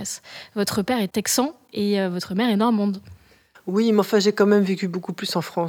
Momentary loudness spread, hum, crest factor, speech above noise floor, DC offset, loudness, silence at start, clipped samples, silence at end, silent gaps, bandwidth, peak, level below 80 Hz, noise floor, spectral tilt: 10 LU; none; 16 dB; 32 dB; under 0.1%; -22 LUFS; 0 s; under 0.1%; 0 s; none; 18 kHz; -6 dBFS; -62 dBFS; -54 dBFS; -4.5 dB/octave